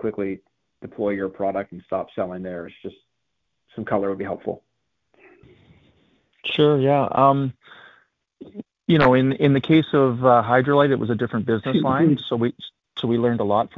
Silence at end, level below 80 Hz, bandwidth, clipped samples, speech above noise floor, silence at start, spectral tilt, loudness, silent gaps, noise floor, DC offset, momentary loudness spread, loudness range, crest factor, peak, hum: 0.1 s; -56 dBFS; 6.2 kHz; under 0.1%; 57 dB; 0 s; -9 dB/octave; -21 LUFS; none; -78 dBFS; under 0.1%; 19 LU; 12 LU; 18 dB; -4 dBFS; none